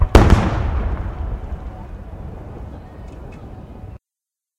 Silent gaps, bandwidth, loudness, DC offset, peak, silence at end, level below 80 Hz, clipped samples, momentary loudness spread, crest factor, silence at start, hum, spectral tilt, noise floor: none; 12.5 kHz; -19 LUFS; under 0.1%; 0 dBFS; 0.6 s; -22 dBFS; under 0.1%; 22 LU; 20 dB; 0 s; none; -7 dB/octave; -87 dBFS